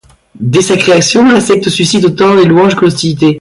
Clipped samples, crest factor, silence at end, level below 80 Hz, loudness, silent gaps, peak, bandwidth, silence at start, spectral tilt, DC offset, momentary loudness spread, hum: under 0.1%; 8 dB; 0 s; -44 dBFS; -8 LUFS; none; 0 dBFS; 11.5 kHz; 0.4 s; -5 dB/octave; under 0.1%; 4 LU; none